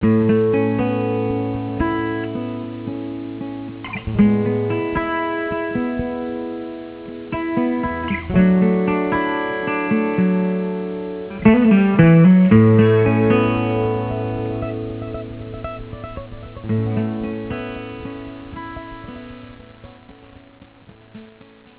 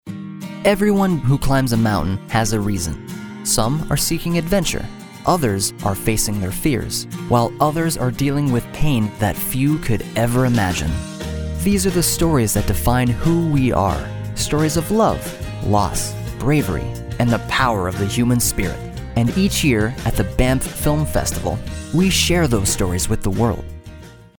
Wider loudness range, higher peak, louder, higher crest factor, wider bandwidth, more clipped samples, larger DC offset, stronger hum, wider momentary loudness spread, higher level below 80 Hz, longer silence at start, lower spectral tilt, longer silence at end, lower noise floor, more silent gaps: first, 14 LU vs 2 LU; first, 0 dBFS vs -4 dBFS; about the same, -18 LUFS vs -19 LUFS; about the same, 18 dB vs 16 dB; second, 4 kHz vs over 20 kHz; neither; neither; neither; first, 20 LU vs 9 LU; second, -40 dBFS vs -30 dBFS; about the same, 0 s vs 0.05 s; first, -12 dB/octave vs -5 dB/octave; first, 0.5 s vs 0.15 s; first, -46 dBFS vs -38 dBFS; neither